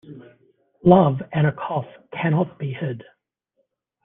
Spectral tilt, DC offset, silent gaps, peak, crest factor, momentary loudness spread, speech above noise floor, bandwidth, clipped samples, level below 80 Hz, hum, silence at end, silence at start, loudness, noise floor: -7.5 dB/octave; under 0.1%; none; -2 dBFS; 20 dB; 15 LU; 52 dB; 3.8 kHz; under 0.1%; -56 dBFS; none; 1 s; 0.05 s; -21 LUFS; -72 dBFS